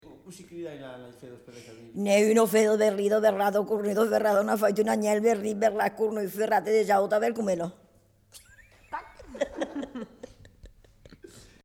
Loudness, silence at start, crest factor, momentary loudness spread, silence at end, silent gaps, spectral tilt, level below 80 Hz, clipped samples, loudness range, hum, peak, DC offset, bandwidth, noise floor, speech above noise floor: -25 LUFS; 0.1 s; 16 dB; 22 LU; 0.25 s; none; -5 dB/octave; -62 dBFS; under 0.1%; 15 LU; none; -12 dBFS; under 0.1%; 18 kHz; -61 dBFS; 36 dB